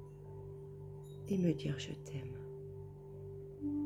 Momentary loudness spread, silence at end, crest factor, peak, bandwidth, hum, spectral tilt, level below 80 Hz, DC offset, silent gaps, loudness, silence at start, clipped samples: 15 LU; 0 s; 20 dB; -20 dBFS; 14 kHz; 50 Hz at -55 dBFS; -7 dB/octave; -64 dBFS; under 0.1%; none; -43 LUFS; 0 s; under 0.1%